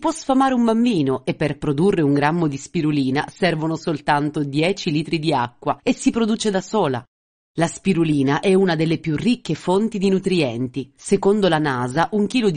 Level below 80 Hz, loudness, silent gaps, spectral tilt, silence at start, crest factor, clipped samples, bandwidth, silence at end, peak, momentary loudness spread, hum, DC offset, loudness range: -52 dBFS; -20 LUFS; 7.08-7.55 s; -6 dB/octave; 0 s; 16 dB; under 0.1%; 10 kHz; 0 s; -4 dBFS; 6 LU; none; under 0.1%; 2 LU